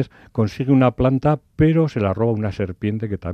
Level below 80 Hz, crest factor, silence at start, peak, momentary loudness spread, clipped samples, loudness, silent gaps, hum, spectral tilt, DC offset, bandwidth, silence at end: -42 dBFS; 16 dB; 0 s; -4 dBFS; 8 LU; under 0.1%; -20 LUFS; none; none; -9.5 dB/octave; under 0.1%; 6.8 kHz; 0 s